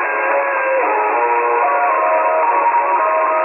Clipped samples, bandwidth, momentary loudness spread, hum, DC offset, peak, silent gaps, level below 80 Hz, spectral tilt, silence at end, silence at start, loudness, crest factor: under 0.1%; 3 kHz; 2 LU; none; under 0.1%; -4 dBFS; none; under -90 dBFS; -7 dB/octave; 0 s; 0 s; -15 LUFS; 10 dB